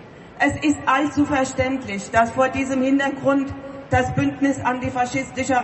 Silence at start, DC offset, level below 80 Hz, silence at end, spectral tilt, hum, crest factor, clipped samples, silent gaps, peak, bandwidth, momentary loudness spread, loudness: 0 s; under 0.1%; -44 dBFS; 0 s; -5.5 dB/octave; none; 16 dB; under 0.1%; none; -4 dBFS; 8.6 kHz; 4 LU; -21 LUFS